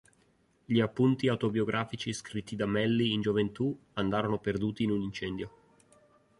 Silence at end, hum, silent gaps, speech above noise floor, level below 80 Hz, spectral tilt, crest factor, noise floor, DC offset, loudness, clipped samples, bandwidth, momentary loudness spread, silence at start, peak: 0.9 s; none; none; 38 dB; -60 dBFS; -6.5 dB/octave; 18 dB; -68 dBFS; under 0.1%; -31 LUFS; under 0.1%; 11.5 kHz; 9 LU; 0.7 s; -12 dBFS